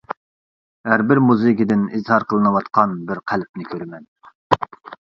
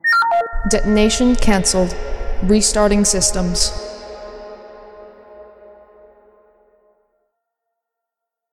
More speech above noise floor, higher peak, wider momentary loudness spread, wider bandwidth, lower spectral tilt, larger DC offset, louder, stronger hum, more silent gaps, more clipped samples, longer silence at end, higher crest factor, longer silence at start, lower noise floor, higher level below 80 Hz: first, over 72 dB vs 68 dB; about the same, 0 dBFS vs 0 dBFS; second, 16 LU vs 20 LU; second, 7 kHz vs 14.5 kHz; first, -8.5 dB/octave vs -3.5 dB/octave; neither; about the same, -18 LUFS vs -16 LUFS; neither; first, 0.17-0.84 s, 3.49-3.54 s, 4.08-4.16 s, 4.35-4.50 s vs none; neither; second, 0.1 s vs 3.1 s; about the same, 20 dB vs 18 dB; about the same, 0.1 s vs 0.05 s; first, under -90 dBFS vs -82 dBFS; second, -56 dBFS vs -26 dBFS